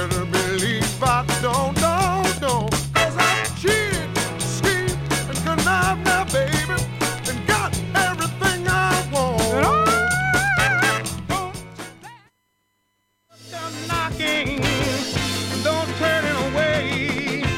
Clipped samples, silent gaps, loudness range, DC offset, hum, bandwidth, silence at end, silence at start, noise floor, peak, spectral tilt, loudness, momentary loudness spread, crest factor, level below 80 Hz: under 0.1%; none; 6 LU; under 0.1%; none; 17 kHz; 0 s; 0 s; -70 dBFS; -6 dBFS; -4 dB/octave; -20 LUFS; 7 LU; 16 dB; -38 dBFS